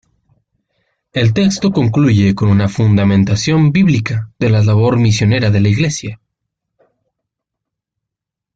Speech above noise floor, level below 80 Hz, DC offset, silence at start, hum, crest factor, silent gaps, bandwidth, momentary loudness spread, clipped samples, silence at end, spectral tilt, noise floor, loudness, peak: 70 dB; -44 dBFS; under 0.1%; 1.15 s; none; 12 dB; none; 7.8 kHz; 6 LU; under 0.1%; 2.4 s; -6.5 dB/octave; -82 dBFS; -13 LUFS; -2 dBFS